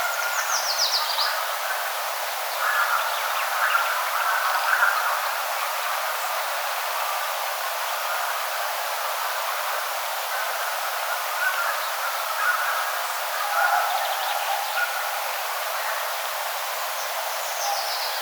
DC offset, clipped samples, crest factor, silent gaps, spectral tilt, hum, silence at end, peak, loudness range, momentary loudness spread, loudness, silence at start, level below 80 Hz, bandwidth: under 0.1%; under 0.1%; 18 dB; none; 7.5 dB/octave; none; 0 s; -6 dBFS; 3 LU; 5 LU; -24 LUFS; 0 s; under -90 dBFS; over 20 kHz